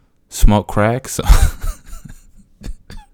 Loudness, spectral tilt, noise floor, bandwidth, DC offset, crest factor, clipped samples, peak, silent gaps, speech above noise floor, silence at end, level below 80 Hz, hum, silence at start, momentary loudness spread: -16 LUFS; -5.5 dB/octave; -43 dBFS; 17 kHz; under 0.1%; 16 dB; under 0.1%; 0 dBFS; none; 30 dB; 0.15 s; -18 dBFS; none; 0.3 s; 23 LU